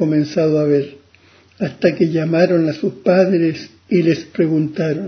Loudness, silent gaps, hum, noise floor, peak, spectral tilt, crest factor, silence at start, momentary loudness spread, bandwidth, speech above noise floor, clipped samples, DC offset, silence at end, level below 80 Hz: -17 LUFS; none; none; -50 dBFS; 0 dBFS; -8 dB/octave; 16 dB; 0 s; 6 LU; 6.6 kHz; 34 dB; under 0.1%; under 0.1%; 0 s; -58 dBFS